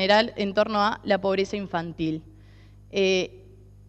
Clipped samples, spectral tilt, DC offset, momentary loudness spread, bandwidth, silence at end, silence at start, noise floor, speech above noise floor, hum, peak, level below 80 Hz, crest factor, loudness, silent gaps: under 0.1%; -5 dB/octave; under 0.1%; 10 LU; 8.4 kHz; 0.5 s; 0 s; -49 dBFS; 25 dB; 50 Hz at -50 dBFS; -8 dBFS; -54 dBFS; 18 dB; -25 LUFS; none